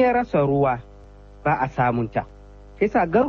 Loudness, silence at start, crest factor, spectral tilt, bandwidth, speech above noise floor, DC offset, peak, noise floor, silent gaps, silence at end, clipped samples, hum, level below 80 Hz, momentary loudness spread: -22 LUFS; 0 s; 16 dB; -9 dB/octave; 6.8 kHz; 24 dB; under 0.1%; -6 dBFS; -44 dBFS; none; 0 s; under 0.1%; 50 Hz at -45 dBFS; -44 dBFS; 10 LU